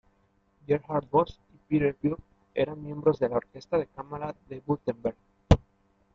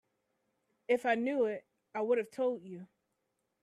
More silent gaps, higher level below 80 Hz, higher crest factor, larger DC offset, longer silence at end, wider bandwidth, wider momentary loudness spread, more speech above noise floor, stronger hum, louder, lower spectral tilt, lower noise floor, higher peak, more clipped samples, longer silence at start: neither; first, -42 dBFS vs -84 dBFS; first, 26 dB vs 18 dB; neither; second, 0.55 s vs 0.8 s; second, 7.6 kHz vs 12.5 kHz; second, 12 LU vs 18 LU; second, 39 dB vs 50 dB; neither; first, -29 LUFS vs -34 LUFS; first, -8 dB/octave vs -5.5 dB/octave; second, -68 dBFS vs -83 dBFS; first, -4 dBFS vs -18 dBFS; neither; second, 0.7 s vs 0.9 s